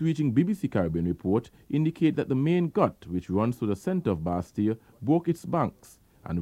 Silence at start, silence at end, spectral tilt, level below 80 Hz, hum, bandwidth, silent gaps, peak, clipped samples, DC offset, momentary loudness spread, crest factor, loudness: 0 s; 0 s; -8.5 dB/octave; -54 dBFS; none; 14 kHz; none; -8 dBFS; under 0.1%; under 0.1%; 6 LU; 20 dB; -27 LUFS